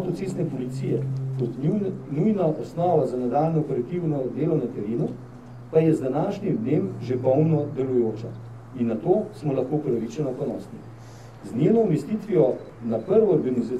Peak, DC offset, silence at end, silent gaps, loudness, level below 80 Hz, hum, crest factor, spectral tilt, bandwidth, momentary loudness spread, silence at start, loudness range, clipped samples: -6 dBFS; 0.2%; 0 s; none; -24 LUFS; -58 dBFS; none; 18 dB; -9.5 dB/octave; 10.5 kHz; 14 LU; 0 s; 2 LU; under 0.1%